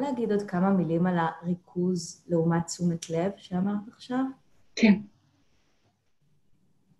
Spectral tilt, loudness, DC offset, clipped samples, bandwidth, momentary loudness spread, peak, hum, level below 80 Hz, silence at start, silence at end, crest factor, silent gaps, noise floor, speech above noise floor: -6.5 dB/octave; -28 LUFS; under 0.1%; under 0.1%; 12 kHz; 10 LU; -10 dBFS; none; -66 dBFS; 0 s; 1.95 s; 20 dB; none; -70 dBFS; 43 dB